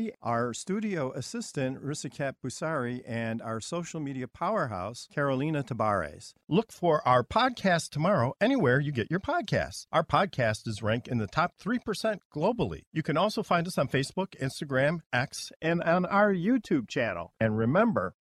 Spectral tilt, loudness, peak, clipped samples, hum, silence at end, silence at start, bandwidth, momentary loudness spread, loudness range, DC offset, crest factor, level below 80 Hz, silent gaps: -5.5 dB/octave; -29 LUFS; -10 dBFS; under 0.1%; none; 0.1 s; 0 s; 14 kHz; 10 LU; 7 LU; under 0.1%; 18 dB; -58 dBFS; 12.25-12.30 s, 12.87-12.92 s, 15.06-15.10 s, 15.56-15.60 s